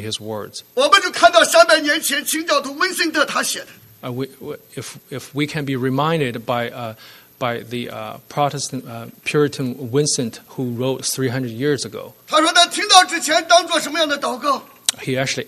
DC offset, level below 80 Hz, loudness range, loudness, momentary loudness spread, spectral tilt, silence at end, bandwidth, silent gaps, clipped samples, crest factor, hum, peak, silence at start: under 0.1%; -62 dBFS; 8 LU; -17 LUFS; 18 LU; -3 dB/octave; 0.05 s; 13.5 kHz; none; under 0.1%; 20 dB; none; 0 dBFS; 0 s